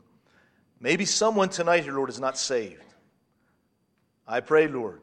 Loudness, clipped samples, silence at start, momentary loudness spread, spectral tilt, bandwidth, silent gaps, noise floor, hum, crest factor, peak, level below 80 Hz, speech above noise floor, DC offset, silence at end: -25 LUFS; under 0.1%; 0.8 s; 10 LU; -3 dB/octave; 10.5 kHz; none; -71 dBFS; none; 20 dB; -8 dBFS; -74 dBFS; 46 dB; under 0.1%; 0.05 s